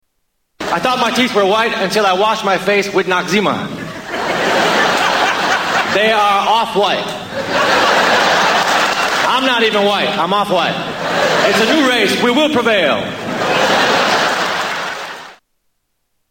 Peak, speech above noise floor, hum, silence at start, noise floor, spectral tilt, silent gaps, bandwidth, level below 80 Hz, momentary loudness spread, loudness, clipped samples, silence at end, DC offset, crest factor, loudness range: -2 dBFS; 53 dB; none; 0.6 s; -67 dBFS; -3 dB/octave; none; 17 kHz; -52 dBFS; 9 LU; -13 LUFS; under 0.1%; 0.95 s; under 0.1%; 14 dB; 2 LU